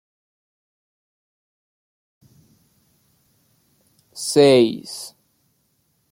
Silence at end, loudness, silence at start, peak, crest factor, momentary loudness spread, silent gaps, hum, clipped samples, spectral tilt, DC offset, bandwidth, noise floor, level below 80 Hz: 1.05 s; -17 LUFS; 4.15 s; -2 dBFS; 22 dB; 24 LU; none; none; under 0.1%; -4.5 dB/octave; under 0.1%; 16.5 kHz; -67 dBFS; -70 dBFS